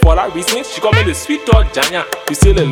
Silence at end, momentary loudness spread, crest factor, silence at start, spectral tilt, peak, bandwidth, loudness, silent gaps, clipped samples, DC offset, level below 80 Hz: 0 s; 6 LU; 12 dB; 0 s; -4.5 dB/octave; 0 dBFS; 18.5 kHz; -14 LUFS; none; 0.8%; under 0.1%; -16 dBFS